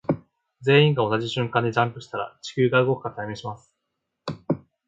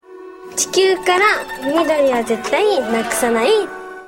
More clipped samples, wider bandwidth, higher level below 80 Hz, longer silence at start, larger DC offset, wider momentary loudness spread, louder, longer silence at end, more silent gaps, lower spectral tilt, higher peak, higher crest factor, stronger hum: neither; second, 7.8 kHz vs 16.5 kHz; second, -62 dBFS vs -52 dBFS; about the same, 0.1 s vs 0.1 s; neither; first, 18 LU vs 6 LU; second, -23 LUFS vs -16 LUFS; first, 0.3 s vs 0 s; neither; first, -6.5 dB/octave vs -2 dB/octave; about the same, -4 dBFS vs -2 dBFS; about the same, 20 dB vs 16 dB; neither